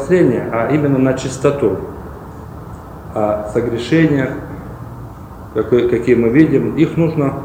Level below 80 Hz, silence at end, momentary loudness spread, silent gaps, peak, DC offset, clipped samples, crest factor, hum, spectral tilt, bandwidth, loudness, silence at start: -38 dBFS; 0 s; 20 LU; none; 0 dBFS; under 0.1%; under 0.1%; 16 dB; none; -7.5 dB/octave; 16 kHz; -15 LUFS; 0 s